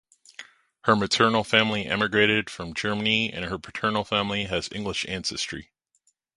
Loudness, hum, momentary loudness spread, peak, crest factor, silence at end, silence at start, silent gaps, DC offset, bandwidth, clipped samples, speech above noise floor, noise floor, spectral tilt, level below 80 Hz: -24 LUFS; none; 12 LU; -2 dBFS; 24 dB; 0.75 s; 0.4 s; none; under 0.1%; 11.5 kHz; under 0.1%; 45 dB; -70 dBFS; -4 dB/octave; -54 dBFS